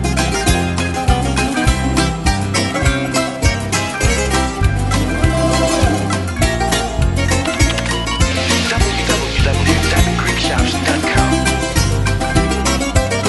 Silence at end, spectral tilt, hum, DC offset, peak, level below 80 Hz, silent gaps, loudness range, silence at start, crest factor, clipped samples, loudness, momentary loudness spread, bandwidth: 0 s; -4.5 dB/octave; none; under 0.1%; 0 dBFS; -22 dBFS; none; 1 LU; 0 s; 14 dB; under 0.1%; -15 LUFS; 3 LU; 12 kHz